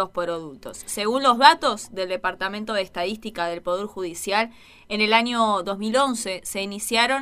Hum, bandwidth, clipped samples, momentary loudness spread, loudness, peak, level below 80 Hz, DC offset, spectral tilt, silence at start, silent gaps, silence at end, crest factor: none; 15.5 kHz; under 0.1%; 13 LU; -22 LUFS; 0 dBFS; -56 dBFS; under 0.1%; -2.5 dB/octave; 0 s; none; 0 s; 22 dB